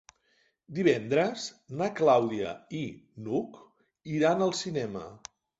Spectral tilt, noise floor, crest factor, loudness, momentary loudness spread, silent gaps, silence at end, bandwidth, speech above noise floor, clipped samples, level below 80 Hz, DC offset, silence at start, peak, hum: -5.5 dB/octave; -71 dBFS; 20 dB; -29 LUFS; 18 LU; none; 0.45 s; 8 kHz; 42 dB; under 0.1%; -68 dBFS; under 0.1%; 0.7 s; -10 dBFS; none